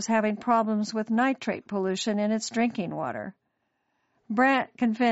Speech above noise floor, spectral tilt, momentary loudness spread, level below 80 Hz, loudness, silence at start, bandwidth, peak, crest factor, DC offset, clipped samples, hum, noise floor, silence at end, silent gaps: 50 dB; -4 dB/octave; 9 LU; -74 dBFS; -27 LUFS; 0 s; 8 kHz; -10 dBFS; 16 dB; under 0.1%; under 0.1%; none; -76 dBFS; 0 s; none